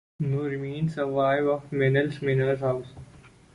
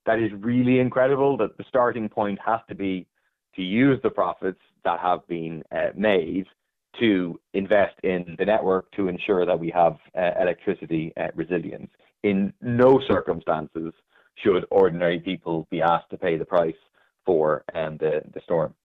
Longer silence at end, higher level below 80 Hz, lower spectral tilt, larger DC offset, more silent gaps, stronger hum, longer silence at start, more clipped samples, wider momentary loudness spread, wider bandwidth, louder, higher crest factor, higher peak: about the same, 0.25 s vs 0.15 s; about the same, -58 dBFS vs -58 dBFS; about the same, -8.5 dB/octave vs -9.5 dB/octave; neither; neither; neither; first, 0.2 s vs 0.05 s; neither; second, 7 LU vs 10 LU; first, 10.5 kHz vs 4.7 kHz; about the same, -26 LUFS vs -24 LUFS; about the same, 16 dB vs 16 dB; second, -10 dBFS vs -6 dBFS